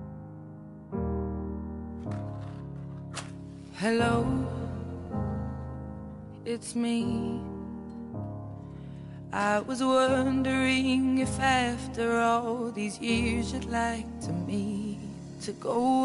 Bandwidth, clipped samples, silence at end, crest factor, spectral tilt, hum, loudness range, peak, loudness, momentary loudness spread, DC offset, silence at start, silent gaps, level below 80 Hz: 11.5 kHz; under 0.1%; 0 s; 18 dB; -5.5 dB/octave; none; 8 LU; -12 dBFS; -30 LUFS; 17 LU; under 0.1%; 0 s; none; -50 dBFS